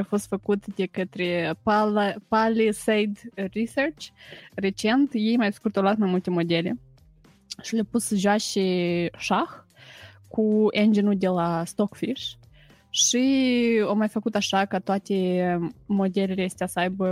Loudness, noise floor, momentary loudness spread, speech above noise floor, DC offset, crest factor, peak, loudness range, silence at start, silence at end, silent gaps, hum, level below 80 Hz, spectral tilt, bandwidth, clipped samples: -24 LUFS; -56 dBFS; 9 LU; 32 dB; under 0.1%; 16 dB; -8 dBFS; 3 LU; 0 s; 0 s; none; none; -60 dBFS; -4.5 dB/octave; 15.5 kHz; under 0.1%